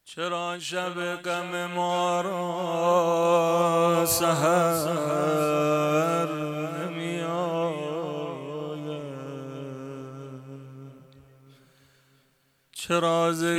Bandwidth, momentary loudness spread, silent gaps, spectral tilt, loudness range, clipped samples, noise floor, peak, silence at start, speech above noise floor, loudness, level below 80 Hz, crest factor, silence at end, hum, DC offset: 17.5 kHz; 16 LU; none; -4.5 dB/octave; 17 LU; under 0.1%; -67 dBFS; -10 dBFS; 0.05 s; 43 dB; -26 LUFS; -68 dBFS; 16 dB; 0 s; none; under 0.1%